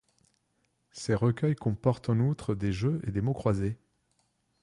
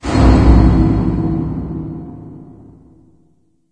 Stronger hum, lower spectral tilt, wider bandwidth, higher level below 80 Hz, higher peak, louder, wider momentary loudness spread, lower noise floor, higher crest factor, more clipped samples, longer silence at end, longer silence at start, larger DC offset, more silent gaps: neither; about the same, -8 dB/octave vs -8.5 dB/octave; first, 11 kHz vs 8.8 kHz; second, -52 dBFS vs -18 dBFS; second, -12 dBFS vs 0 dBFS; second, -30 LUFS vs -13 LUFS; second, 7 LU vs 22 LU; first, -75 dBFS vs -57 dBFS; about the same, 18 dB vs 14 dB; second, under 0.1% vs 0.2%; second, 0.85 s vs 1.3 s; first, 0.95 s vs 0 s; neither; neither